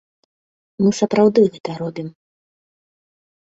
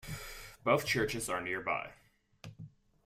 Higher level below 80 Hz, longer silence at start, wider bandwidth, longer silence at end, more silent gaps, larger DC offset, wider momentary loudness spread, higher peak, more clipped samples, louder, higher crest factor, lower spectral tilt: about the same, -62 dBFS vs -58 dBFS; first, 0.8 s vs 0.05 s; second, 7.8 kHz vs 16 kHz; first, 1.35 s vs 0.4 s; first, 1.60-1.64 s vs none; neither; second, 16 LU vs 24 LU; first, -2 dBFS vs -14 dBFS; neither; first, -18 LUFS vs -34 LUFS; about the same, 18 dB vs 22 dB; first, -6.5 dB/octave vs -4 dB/octave